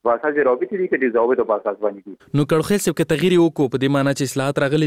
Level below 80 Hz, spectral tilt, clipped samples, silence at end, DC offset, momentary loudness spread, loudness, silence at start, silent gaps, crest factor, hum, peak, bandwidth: -54 dBFS; -6 dB/octave; under 0.1%; 0 s; under 0.1%; 7 LU; -19 LUFS; 0.05 s; none; 14 dB; none; -4 dBFS; 16 kHz